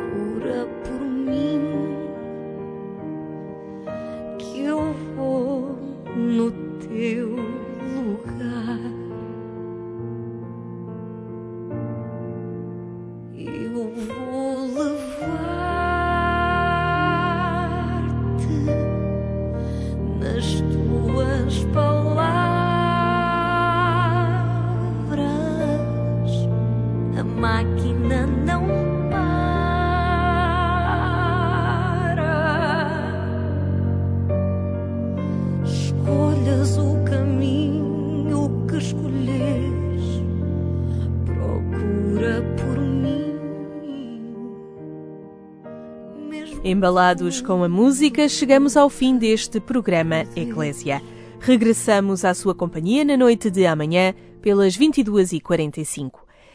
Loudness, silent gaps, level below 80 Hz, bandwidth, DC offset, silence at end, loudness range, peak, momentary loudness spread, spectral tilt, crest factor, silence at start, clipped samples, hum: -22 LUFS; none; -36 dBFS; 11 kHz; under 0.1%; 0.4 s; 11 LU; 0 dBFS; 15 LU; -6.5 dB/octave; 20 dB; 0 s; under 0.1%; none